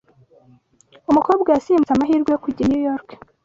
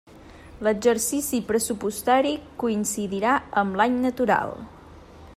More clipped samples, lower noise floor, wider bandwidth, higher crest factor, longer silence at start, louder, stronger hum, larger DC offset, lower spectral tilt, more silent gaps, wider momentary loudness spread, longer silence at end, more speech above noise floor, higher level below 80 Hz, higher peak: neither; first, -54 dBFS vs -46 dBFS; second, 7.6 kHz vs 16 kHz; about the same, 16 dB vs 16 dB; first, 1.1 s vs 0.15 s; first, -18 LUFS vs -24 LUFS; neither; neither; first, -7.5 dB/octave vs -4 dB/octave; neither; about the same, 7 LU vs 6 LU; first, 0.45 s vs 0 s; first, 36 dB vs 22 dB; about the same, -52 dBFS vs -54 dBFS; first, -2 dBFS vs -8 dBFS